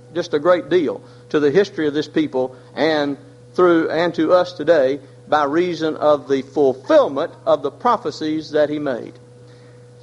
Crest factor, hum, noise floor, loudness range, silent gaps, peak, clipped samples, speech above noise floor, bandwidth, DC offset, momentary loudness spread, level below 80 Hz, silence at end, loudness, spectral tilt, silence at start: 16 dB; none; -43 dBFS; 2 LU; none; -2 dBFS; under 0.1%; 25 dB; 10.5 kHz; under 0.1%; 10 LU; -62 dBFS; 0.9 s; -18 LUFS; -6 dB/octave; 0.15 s